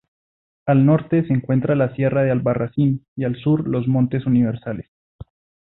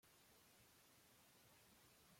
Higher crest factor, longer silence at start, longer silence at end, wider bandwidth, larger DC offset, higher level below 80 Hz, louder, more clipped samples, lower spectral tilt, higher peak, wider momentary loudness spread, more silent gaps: about the same, 14 dB vs 14 dB; first, 0.65 s vs 0 s; first, 0.45 s vs 0 s; second, 4 kHz vs 16.5 kHz; neither; first, -52 dBFS vs -90 dBFS; first, -19 LUFS vs -70 LUFS; neither; first, -13.5 dB/octave vs -2.5 dB/octave; first, -6 dBFS vs -58 dBFS; first, 9 LU vs 0 LU; first, 3.08-3.16 s, 4.88-5.19 s vs none